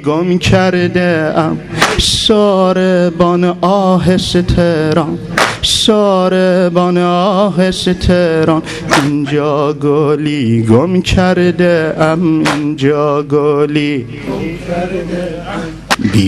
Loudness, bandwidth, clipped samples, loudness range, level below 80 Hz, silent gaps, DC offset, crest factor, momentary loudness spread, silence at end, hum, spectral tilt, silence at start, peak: -12 LUFS; 14 kHz; under 0.1%; 3 LU; -30 dBFS; none; under 0.1%; 12 dB; 8 LU; 0 s; none; -5.5 dB/octave; 0 s; 0 dBFS